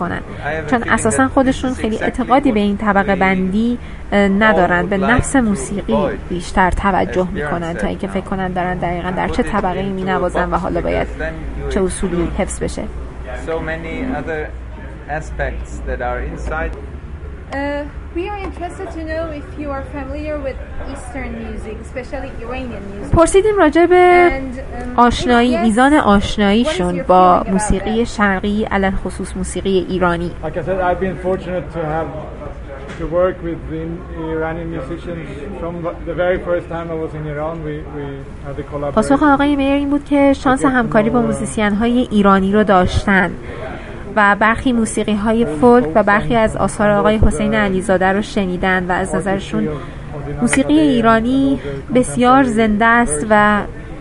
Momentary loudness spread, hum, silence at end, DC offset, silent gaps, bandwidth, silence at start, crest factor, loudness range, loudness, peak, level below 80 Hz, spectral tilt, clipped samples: 15 LU; none; 0 s; 0.3%; none; 11.5 kHz; 0 s; 16 dB; 11 LU; -16 LUFS; 0 dBFS; -30 dBFS; -5.5 dB/octave; under 0.1%